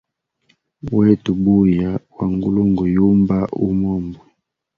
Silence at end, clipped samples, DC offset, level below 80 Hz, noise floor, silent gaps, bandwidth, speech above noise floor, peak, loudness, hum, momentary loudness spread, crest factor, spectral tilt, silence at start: 0.6 s; under 0.1%; under 0.1%; -42 dBFS; -63 dBFS; none; 4.6 kHz; 47 dB; -2 dBFS; -17 LUFS; none; 9 LU; 16 dB; -10.5 dB/octave; 0.85 s